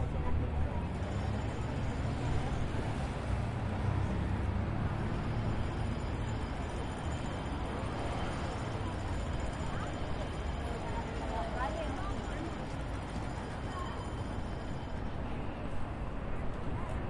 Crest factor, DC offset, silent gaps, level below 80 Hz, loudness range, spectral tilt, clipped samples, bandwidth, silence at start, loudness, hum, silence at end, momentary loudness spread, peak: 14 dB; under 0.1%; none; -40 dBFS; 4 LU; -7 dB/octave; under 0.1%; 11.5 kHz; 0 s; -37 LUFS; none; 0 s; 5 LU; -20 dBFS